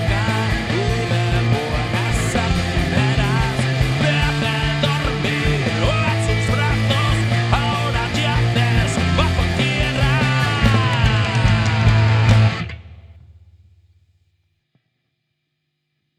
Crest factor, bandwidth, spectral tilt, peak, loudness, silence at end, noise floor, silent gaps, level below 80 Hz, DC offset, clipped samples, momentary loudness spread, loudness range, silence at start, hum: 18 dB; 13 kHz; -5.5 dB/octave; 0 dBFS; -18 LUFS; 3.05 s; -74 dBFS; none; -28 dBFS; under 0.1%; under 0.1%; 4 LU; 3 LU; 0 s; none